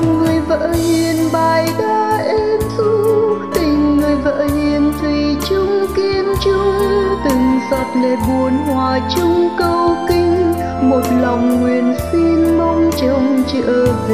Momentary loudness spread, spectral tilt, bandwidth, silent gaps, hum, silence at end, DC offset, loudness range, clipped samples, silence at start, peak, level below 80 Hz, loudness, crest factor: 3 LU; -6 dB/octave; 15.5 kHz; none; none; 0 s; 0.6%; 1 LU; under 0.1%; 0 s; -2 dBFS; -32 dBFS; -15 LUFS; 12 dB